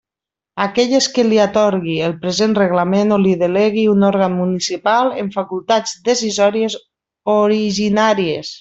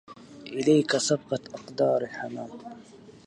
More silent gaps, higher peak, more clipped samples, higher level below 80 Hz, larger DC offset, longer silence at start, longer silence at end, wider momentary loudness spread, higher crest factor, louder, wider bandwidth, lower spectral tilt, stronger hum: neither; first, -2 dBFS vs -10 dBFS; neither; first, -56 dBFS vs -70 dBFS; neither; first, 0.55 s vs 0.1 s; second, 0 s vs 0.15 s; second, 8 LU vs 22 LU; about the same, 14 dB vs 18 dB; first, -16 LUFS vs -26 LUFS; second, 8 kHz vs 11 kHz; about the same, -5 dB/octave vs -4.5 dB/octave; neither